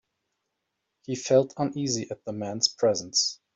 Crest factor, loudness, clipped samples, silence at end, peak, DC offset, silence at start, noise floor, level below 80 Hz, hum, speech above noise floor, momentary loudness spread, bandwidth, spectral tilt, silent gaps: 22 dB; -26 LUFS; under 0.1%; 0.2 s; -8 dBFS; under 0.1%; 1.1 s; -81 dBFS; -68 dBFS; none; 54 dB; 12 LU; 8.2 kHz; -3.5 dB/octave; none